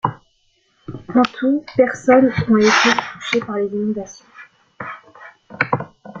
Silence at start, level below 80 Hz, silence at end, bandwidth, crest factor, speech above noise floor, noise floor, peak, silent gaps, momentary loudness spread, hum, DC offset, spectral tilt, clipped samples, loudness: 0.05 s; -54 dBFS; 0 s; 7.6 kHz; 18 dB; 46 dB; -62 dBFS; 0 dBFS; none; 21 LU; none; under 0.1%; -5 dB/octave; under 0.1%; -17 LUFS